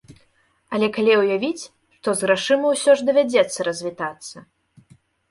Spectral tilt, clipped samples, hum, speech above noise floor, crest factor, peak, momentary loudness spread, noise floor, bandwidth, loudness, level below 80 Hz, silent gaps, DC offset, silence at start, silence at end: -3.5 dB/octave; under 0.1%; none; 42 dB; 18 dB; -4 dBFS; 13 LU; -62 dBFS; 12 kHz; -20 LUFS; -66 dBFS; none; under 0.1%; 0.1 s; 0.9 s